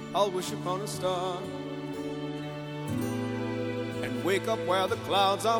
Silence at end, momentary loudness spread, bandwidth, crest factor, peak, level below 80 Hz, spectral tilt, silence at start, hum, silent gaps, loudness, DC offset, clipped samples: 0 s; 10 LU; over 20 kHz; 18 dB; -12 dBFS; -62 dBFS; -5 dB/octave; 0 s; none; none; -31 LUFS; under 0.1%; under 0.1%